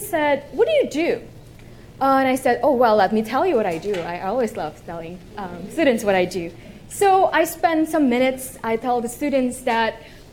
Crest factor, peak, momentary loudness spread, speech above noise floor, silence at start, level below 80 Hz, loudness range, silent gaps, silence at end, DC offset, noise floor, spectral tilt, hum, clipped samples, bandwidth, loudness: 16 dB; -4 dBFS; 15 LU; 22 dB; 0 s; -48 dBFS; 3 LU; none; 0 s; under 0.1%; -42 dBFS; -4.5 dB/octave; none; under 0.1%; 17.5 kHz; -20 LUFS